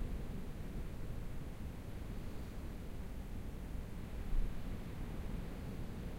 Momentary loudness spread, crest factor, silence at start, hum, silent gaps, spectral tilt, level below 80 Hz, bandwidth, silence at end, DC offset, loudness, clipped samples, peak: 4 LU; 16 dB; 0 s; none; none; -7 dB/octave; -44 dBFS; 16 kHz; 0 s; under 0.1%; -47 LUFS; under 0.1%; -26 dBFS